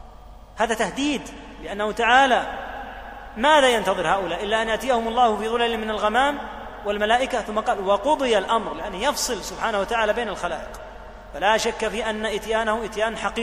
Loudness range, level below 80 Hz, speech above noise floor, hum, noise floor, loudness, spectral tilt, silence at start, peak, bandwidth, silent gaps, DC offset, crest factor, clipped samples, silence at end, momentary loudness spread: 4 LU; -44 dBFS; 21 dB; none; -43 dBFS; -22 LUFS; -3 dB/octave; 0 s; -2 dBFS; 15.5 kHz; none; under 0.1%; 20 dB; under 0.1%; 0 s; 16 LU